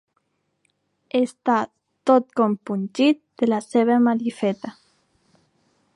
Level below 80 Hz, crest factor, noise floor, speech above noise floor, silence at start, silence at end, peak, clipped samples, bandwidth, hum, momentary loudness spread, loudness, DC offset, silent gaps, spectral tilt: -76 dBFS; 18 dB; -71 dBFS; 51 dB; 1.15 s; 1.25 s; -4 dBFS; under 0.1%; 11 kHz; none; 9 LU; -21 LUFS; under 0.1%; none; -6 dB/octave